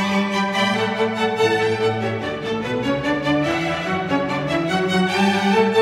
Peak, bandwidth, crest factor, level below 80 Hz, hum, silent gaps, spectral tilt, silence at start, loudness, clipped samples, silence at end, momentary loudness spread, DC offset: -4 dBFS; 15 kHz; 14 dB; -50 dBFS; none; none; -5.5 dB/octave; 0 s; -20 LUFS; under 0.1%; 0 s; 6 LU; under 0.1%